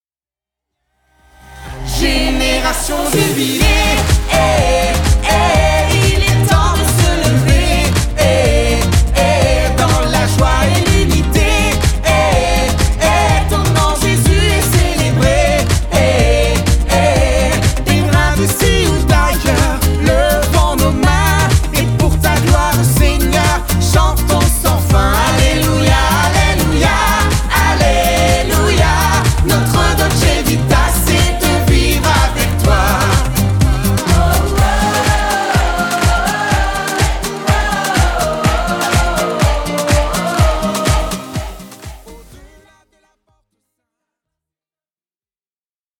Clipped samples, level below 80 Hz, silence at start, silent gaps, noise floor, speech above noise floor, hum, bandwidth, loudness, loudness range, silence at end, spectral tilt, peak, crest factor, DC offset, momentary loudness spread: under 0.1%; -18 dBFS; 1.5 s; none; under -90 dBFS; over 77 dB; none; 19.5 kHz; -13 LUFS; 3 LU; 3.65 s; -4.5 dB/octave; 0 dBFS; 12 dB; under 0.1%; 3 LU